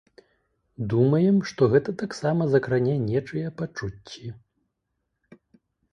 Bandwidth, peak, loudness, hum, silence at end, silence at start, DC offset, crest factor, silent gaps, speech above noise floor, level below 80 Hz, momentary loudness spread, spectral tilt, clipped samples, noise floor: 11 kHz; -8 dBFS; -24 LUFS; none; 1.6 s; 0.8 s; under 0.1%; 18 dB; none; 55 dB; -56 dBFS; 16 LU; -8 dB/octave; under 0.1%; -79 dBFS